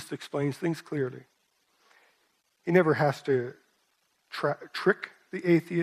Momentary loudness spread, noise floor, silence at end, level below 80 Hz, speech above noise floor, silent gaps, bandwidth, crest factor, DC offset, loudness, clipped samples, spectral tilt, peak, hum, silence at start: 15 LU; -72 dBFS; 0 s; -76 dBFS; 45 dB; none; 14 kHz; 22 dB; under 0.1%; -28 LUFS; under 0.1%; -7 dB/octave; -8 dBFS; none; 0 s